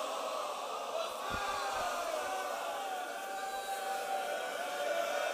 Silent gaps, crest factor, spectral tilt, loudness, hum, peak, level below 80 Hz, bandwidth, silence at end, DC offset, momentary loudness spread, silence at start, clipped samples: none; 16 dB; -1.5 dB/octave; -37 LUFS; none; -22 dBFS; -64 dBFS; 15.5 kHz; 0 s; under 0.1%; 4 LU; 0 s; under 0.1%